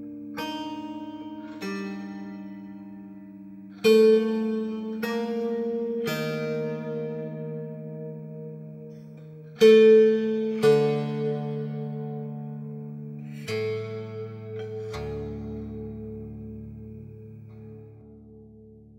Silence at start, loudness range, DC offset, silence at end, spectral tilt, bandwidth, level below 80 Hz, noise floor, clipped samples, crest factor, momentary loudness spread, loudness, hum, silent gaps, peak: 0 s; 16 LU; under 0.1%; 0 s; -6.5 dB/octave; 15.5 kHz; -56 dBFS; -49 dBFS; under 0.1%; 20 dB; 24 LU; -25 LUFS; none; none; -6 dBFS